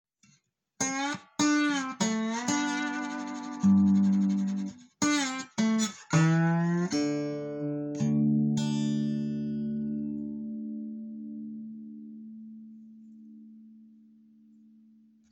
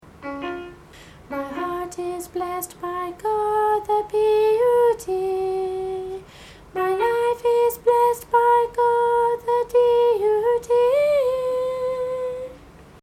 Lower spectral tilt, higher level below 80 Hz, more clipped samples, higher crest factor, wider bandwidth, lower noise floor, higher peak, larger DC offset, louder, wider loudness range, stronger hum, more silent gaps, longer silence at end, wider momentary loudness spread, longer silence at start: about the same, -5 dB/octave vs -4.5 dB/octave; second, -70 dBFS vs -54 dBFS; neither; about the same, 18 dB vs 14 dB; about the same, 16.5 kHz vs 16 kHz; first, -70 dBFS vs -45 dBFS; second, -12 dBFS vs -6 dBFS; neither; second, -29 LUFS vs -21 LUFS; first, 16 LU vs 6 LU; neither; neither; first, 1.45 s vs 0.2 s; first, 17 LU vs 13 LU; first, 0.8 s vs 0.2 s